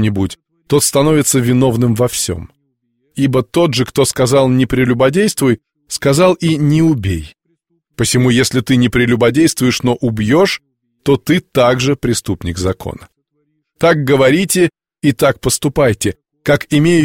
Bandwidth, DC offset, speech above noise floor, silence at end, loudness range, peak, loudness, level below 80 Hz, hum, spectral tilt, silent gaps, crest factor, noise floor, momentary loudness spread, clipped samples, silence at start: 16.5 kHz; under 0.1%; 52 dB; 0 s; 2 LU; 0 dBFS; -13 LUFS; -40 dBFS; none; -5 dB/octave; none; 14 dB; -65 dBFS; 9 LU; under 0.1%; 0 s